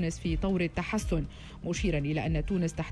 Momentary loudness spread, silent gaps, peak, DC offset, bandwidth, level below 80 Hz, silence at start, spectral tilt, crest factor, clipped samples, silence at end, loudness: 5 LU; none; -18 dBFS; under 0.1%; 11 kHz; -38 dBFS; 0 s; -6 dB/octave; 12 dB; under 0.1%; 0 s; -31 LUFS